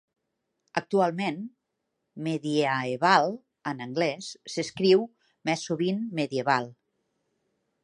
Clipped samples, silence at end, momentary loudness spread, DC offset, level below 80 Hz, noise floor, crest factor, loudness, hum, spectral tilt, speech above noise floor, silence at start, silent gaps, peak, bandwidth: under 0.1%; 1.1 s; 14 LU; under 0.1%; -76 dBFS; -81 dBFS; 24 dB; -27 LUFS; none; -5 dB/octave; 54 dB; 0.75 s; none; -4 dBFS; 11 kHz